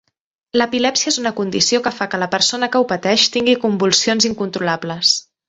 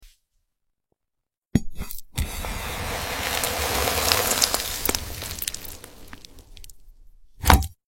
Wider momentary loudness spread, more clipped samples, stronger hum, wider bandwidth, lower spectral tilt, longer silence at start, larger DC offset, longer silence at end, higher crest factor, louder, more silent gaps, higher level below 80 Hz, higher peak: second, 7 LU vs 19 LU; neither; neither; second, 8.4 kHz vs 16.5 kHz; about the same, -2.5 dB/octave vs -3 dB/octave; first, 0.55 s vs 0 s; neither; about the same, 0.25 s vs 0.15 s; second, 16 dB vs 26 dB; first, -16 LUFS vs -24 LUFS; second, none vs 1.38-1.42 s; second, -58 dBFS vs -34 dBFS; about the same, 0 dBFS vs 0 dBFS